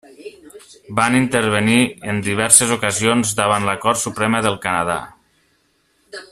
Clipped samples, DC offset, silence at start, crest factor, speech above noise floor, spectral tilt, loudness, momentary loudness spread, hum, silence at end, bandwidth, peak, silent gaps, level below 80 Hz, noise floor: under 0.1%; under 0.1%; 0.2 s; 18 dB; 45 dB; -3 dB/octave; -16 LUFS; 13 LU; none; 0.05 s; 15.5 kHz; 0 dBFS; none; -54 dBFS; -62 dBFS